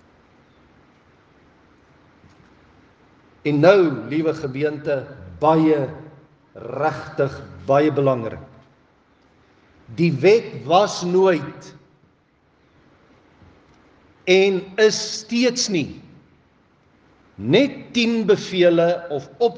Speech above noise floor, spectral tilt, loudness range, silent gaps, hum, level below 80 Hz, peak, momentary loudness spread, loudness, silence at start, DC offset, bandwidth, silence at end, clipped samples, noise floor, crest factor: 41 dB; -5 dB/octave; 4 LU; none; none; -62 dBFS; 0 dBFS; 15 LU; -19 LUFS; 3.45 s; under 0.1%; 9.6 kHz; 0 s; under 0.1%; -60 dBFS; 20 dB